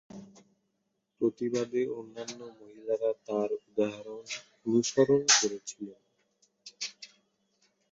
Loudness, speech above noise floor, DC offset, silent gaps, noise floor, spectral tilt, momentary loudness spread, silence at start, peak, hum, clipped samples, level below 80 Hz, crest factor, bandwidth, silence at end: -30 LUFS; 50 dB; under 0.1%; none; -80 dBFS; -2.5 dB/octave; 22 LU; 0.1 s; -8 dBFS; none; under 0.1%; -76 dBFS; 24 dB; 8 kHz; 0.85 s